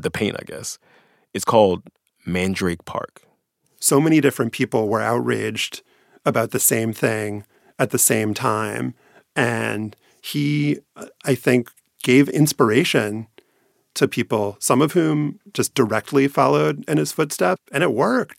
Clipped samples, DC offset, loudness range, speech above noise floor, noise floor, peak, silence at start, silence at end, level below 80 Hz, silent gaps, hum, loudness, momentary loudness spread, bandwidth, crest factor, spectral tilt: under 0.1%; under 0.1%; 4 LU; 45 dB; -65 dBFS; 0 dBFS; 0 s; 0.15 s; -60 dBFS; none; none; -20 LUFS; 14 LU; 16.5 kHz; 20 dB; -4.5 dB/octave